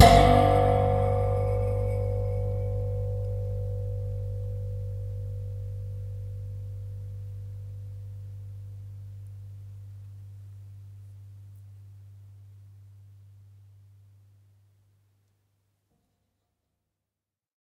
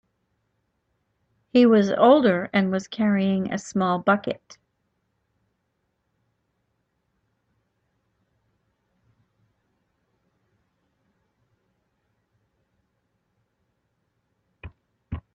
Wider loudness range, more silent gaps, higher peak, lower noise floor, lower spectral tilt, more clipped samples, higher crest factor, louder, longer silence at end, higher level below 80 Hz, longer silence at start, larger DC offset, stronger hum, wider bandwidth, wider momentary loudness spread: first, 23 LU vs 9 LU; neither; about the same, -2 dBFS vs -4 dBFS; first, -89 dBFS vs -75 dBFS; about the same, -6.5 dB/octave vs -6.5 dB/octave; neither; about the same, 26 dB vs 24 dB; second, -28 LUFS vs -21 LUFS; first, 4.65 s vs 0.15 s; first, -38 dBFS vs -58 dBFS; second, 0 s vs 1.55 s; neither; neither; first, 14.5 kHz vs 8.4 kHz; first, 24 LU vs 15 LU